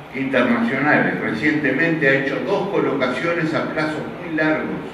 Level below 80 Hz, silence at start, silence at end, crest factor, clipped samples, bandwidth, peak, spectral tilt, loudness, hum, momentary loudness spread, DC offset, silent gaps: -56 dBFS; 0 s; 0 s; 18 dB; under 0.1%; 11.5 kHz; -2 dBFS; -6.5 dB/octave; -19 LUFS; none; 6 LU; under 0.1%; none